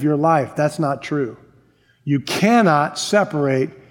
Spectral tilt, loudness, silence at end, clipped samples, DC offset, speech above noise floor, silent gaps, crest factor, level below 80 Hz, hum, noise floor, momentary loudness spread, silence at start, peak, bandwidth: -5.5 dB/octave; -18 LUFS; 0.2 s; under 0.1%; under 0.1%; 38 dB; none; 16 dB; -64 dBFS; none; -56 dBFS; 9 LU; 0 s; -2 dBFS; 17.5 kHz